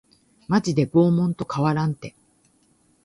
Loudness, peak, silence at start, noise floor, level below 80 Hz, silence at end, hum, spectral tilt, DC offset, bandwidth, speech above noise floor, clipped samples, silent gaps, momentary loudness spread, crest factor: -22 LUFS; -6 dBFS; 0.5 s; -62 dBFS; -58 dBFS; 0.95 s; none; -7.5 dB/octave; under 0.1%; 11.5 kHz; 41 dB; under 0.1%; none; 10 LU; 18 dB